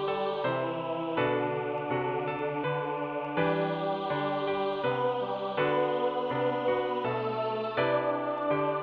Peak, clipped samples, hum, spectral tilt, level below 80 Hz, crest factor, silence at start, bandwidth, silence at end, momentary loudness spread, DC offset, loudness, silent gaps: -14 dBFS; under 0.1%; none; -8.5 dB/octave; -68 dBFS; 16 dB; 0 s; 5.4 kHz; 0 s; 4 LU; under 0.1%; -30 LUFS; none